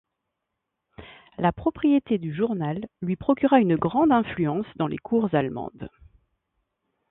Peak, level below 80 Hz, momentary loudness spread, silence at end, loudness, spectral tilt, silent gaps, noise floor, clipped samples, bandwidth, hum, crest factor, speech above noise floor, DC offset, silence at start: -6 dBFS; -54 dBFS; 12 LU; 1.25 s; -24 LUFS; -12 dB/octave; none; -82 dBFS; under 0.1%; 4 kHz; none; 20 dB; 59 dB; under 0.1%; 1 s